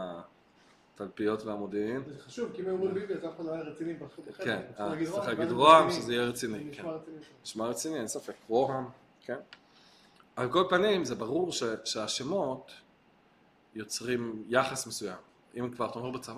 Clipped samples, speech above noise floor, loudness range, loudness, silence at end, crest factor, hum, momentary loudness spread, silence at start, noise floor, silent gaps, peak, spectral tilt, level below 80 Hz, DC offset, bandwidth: under 0.1%; 33 dB; 8 LU; -31 LUFS; 0 s; 26 dB; none; 17 LU; 0 s; -64 dBFS; none; -6 dBFS; -4 dB/octave; -70 dBFS; under 0.1%; 15 kHz